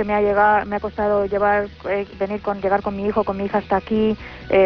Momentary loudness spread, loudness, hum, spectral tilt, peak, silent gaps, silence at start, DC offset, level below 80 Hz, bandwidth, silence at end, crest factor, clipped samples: 9 LU; -20 LUFS; none; -8.5 dB/octave; -6 dBFS; none; 0 s; under 0.1%; -42 dBFS; 5.4 kHz; 0 s; 14 dB; under 0.1%